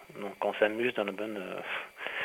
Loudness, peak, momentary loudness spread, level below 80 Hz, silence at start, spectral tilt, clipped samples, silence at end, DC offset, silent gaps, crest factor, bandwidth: -33 LUFS; -12 dBFS; 9 LU; -76 dBFS; 0 s; -5 dB/octave; under 0.1%; 0 s; under 0.1%; none; 20 dB; 16.5 kHz